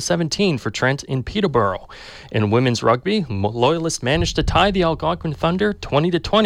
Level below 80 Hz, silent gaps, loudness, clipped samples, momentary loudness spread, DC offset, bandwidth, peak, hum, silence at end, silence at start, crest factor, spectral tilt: -36 dBFS; none; -19 LUFS; under 0.1%; 6 LU; under 0.1%; 14 kHz; -4 dBFS; none; 0 s; 0 s; 14 dB; -5 dB/octave